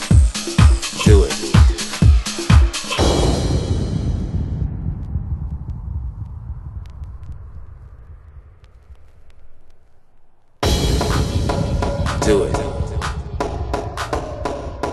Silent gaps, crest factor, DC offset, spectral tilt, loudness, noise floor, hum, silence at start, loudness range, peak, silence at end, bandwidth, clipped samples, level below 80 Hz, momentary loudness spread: none; 18 dB; under 0.1%; -5.5 dB/octave; -19 LUFS; -44 dBFS; none; 0 s; 19 LU; 0 dBFS; 0 s; 12.5 kHz; under 0.1%; -22 dBFS; 18 LU